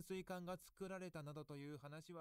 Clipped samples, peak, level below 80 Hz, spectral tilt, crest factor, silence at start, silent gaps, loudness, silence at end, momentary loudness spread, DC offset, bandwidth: under 0.1%; -36 dBFS; -76 dBFS; -6 dB/octave; 16 dB; 0 s; none; -53 LUFS; 0 s; 5 LU; under 0.1%; 16 kHz